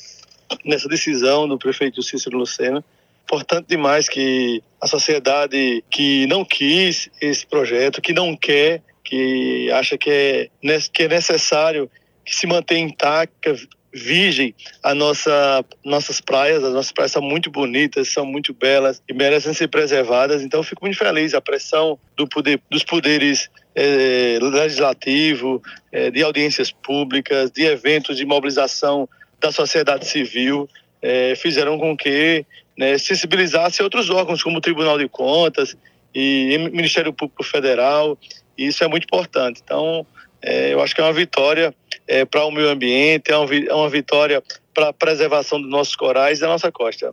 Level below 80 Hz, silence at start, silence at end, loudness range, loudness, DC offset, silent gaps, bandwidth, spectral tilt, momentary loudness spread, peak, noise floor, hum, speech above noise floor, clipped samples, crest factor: -70 dBFS; 0 s; 0 s; 3 LU; -18 LUFS; under 0.1%; none; 11.5 kHz; -3 dB/octave; 7 LU; 0 dBFS; -44 dBFS; none; 27 dB; under 0.1%; 18 dB